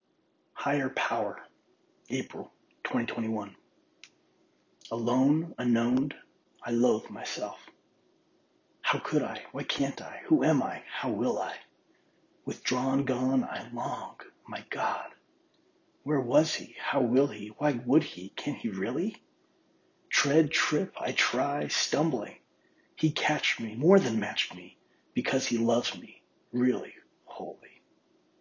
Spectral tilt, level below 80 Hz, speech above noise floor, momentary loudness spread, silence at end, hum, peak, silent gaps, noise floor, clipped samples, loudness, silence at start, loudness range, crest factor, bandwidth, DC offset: -4.5 dB/octave; -74 dBFS; 42 dB; 16 LU; 0.75 s; none; -8 dBFS; none; -71 dBFS; under 0.1%; -29 LUFS; 0.55 s; 6 LU; 22 dB; 7.4 kHz; under 0.1%